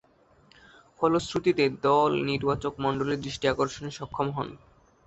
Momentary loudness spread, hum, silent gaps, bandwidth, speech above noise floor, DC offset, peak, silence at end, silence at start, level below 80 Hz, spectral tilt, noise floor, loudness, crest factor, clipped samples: 9 LU; none; none; 8.2 kHz; 33 dB; under 0.1%; -8 dBFS; 0.5 s; 1 s; -54 dBFS; -5.5 dB/octave; -60 dBFS; -27 LUFS; 18 dB; under 0.1%